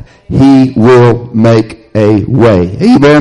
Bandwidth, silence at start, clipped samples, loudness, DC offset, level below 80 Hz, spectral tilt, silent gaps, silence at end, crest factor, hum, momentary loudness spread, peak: 10.5 kHz; 0 s; 0.3%; -7 LUFS; under 0.1%; -34 dBFS; -8 dB/octave; none; 0 s; 6 dB; none; 6 LU; 0 dBFS